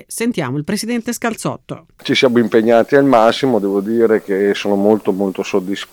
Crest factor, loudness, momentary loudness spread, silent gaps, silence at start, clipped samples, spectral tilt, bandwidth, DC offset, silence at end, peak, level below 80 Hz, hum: 14 dB; -15 LUFS; 9 LU; none; 0.1 s; under 0.1%; -5 dB/octave; 18.5 kHz; under 0.1%; 0.1 s; 0 dBFS; -56 dBFS; none